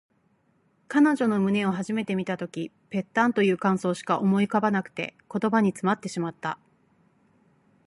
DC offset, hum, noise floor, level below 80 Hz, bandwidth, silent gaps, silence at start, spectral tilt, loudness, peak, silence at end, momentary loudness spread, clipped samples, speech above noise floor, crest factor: under 0.1%; none; -67 dBFS; -70 dBFS; 11.5 kHz; none; 0.9 s; -6.5 dB/octave; -26 LUFS; -8 dBFS; 1.3 s; 12 LU; under 0.1%; 42 dB; 18 dB